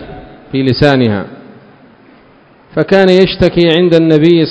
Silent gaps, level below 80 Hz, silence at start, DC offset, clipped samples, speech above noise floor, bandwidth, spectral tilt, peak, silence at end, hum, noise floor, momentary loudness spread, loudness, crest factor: none; -36 dBFS; 0 s; under 0.1%; 1%; 35 dB; 8 kHz; -7.5 dB/octave; 0 dBFS; 0 s; none; -43 dBFS; 12 LU; -10 LUFS; 10 dB